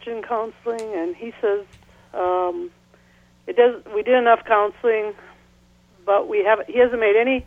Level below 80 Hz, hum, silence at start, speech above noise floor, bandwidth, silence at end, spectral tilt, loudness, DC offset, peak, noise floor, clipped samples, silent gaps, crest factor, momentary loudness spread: -56 dBFS; none; 0.05 s; 35 dB; 9.6 kHz; 0.05 s; -5 dB/octave; -20 LUFS; under 0.1%; -2 dBFS; -55 dBFS; under 0.1%; none; 18 dB; 13 LU